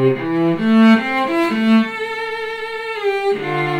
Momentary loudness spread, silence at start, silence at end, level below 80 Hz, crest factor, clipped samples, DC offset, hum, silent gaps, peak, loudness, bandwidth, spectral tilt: 12 LU; 0 s; 0 s; -58 dBFS; 16 dB; under 0.1%; under 0.1%; none; none; -2 dBFS; -17 LUFS; 10 kHz; -7 dB/octave